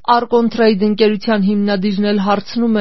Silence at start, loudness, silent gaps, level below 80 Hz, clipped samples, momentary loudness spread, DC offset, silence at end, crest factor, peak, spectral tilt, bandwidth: 0.05 s; -15 LUFS; none; -56 dBFS; under 0.1%; 3 LU; 2%; 0 s; 14 dB; 0 dBFS; -5 dB/octave; 6 kHz